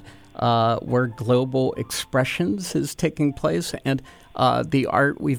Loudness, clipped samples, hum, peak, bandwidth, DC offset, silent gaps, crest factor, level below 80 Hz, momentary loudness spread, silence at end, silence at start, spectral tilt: -23 LUFS; under 0.1%; none; -6 dBFS; 19 kHz; under 0.1%; none; 16 dB; -50 dBFS; 6 LU; 0 s; 0 s; -5.5 dB/octave